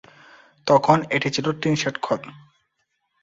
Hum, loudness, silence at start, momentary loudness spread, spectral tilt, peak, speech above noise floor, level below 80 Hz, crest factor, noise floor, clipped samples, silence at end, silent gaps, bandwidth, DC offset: none; -21 LUFS; 0.65 s; 12 LU; -5 dB/octave; -2 dBFS; 52 dB; -62 dBFS; 22 dB; -73 dBFS; under 0.1%; 0.85 s; none; 7.8 kHz; under 0.1%